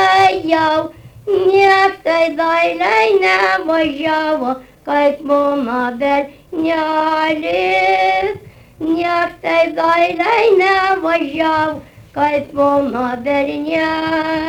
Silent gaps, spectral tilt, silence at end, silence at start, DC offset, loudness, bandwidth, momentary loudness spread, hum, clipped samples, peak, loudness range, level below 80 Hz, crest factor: none; -4.5 dB/octave; 0 s; 0 s; under 0.1%; -15 LUFS; 19 kHz; 8 LU; none; under 0.1%; -2 dBFS; 3 LU; -50 dBFS; 14 dB